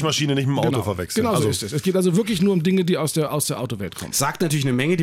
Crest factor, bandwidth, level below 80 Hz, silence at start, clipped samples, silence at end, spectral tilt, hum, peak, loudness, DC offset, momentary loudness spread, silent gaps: 12 dB; 16.5 kHz; -54 dBFS; 0 s; under 0.1%; 0 s; -5 dB/octave; none; -8 dBFS; -21 LUFS; under 0.1%; 5 LU; none